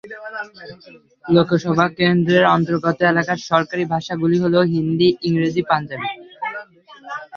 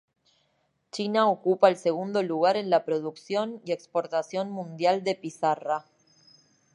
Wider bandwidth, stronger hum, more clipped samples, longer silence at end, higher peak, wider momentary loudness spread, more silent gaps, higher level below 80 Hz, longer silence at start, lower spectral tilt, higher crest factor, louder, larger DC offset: second, 7 kHz vs 11 kHz; neither; neither; second, 0 s vs 0.95 s; about the same, -2 dBFS vs -4 dBFS; first, 16 LU vs 10 LU; neither; first, -58 dBFS vs -82 dBFS; second, 0.05 s vs 0.95 s; first, -7 dB/octave vs -5.5 dB/octave; about the same, 18 dB vs 22 dB; first, -18 LUFS vs -27 LUFS; neither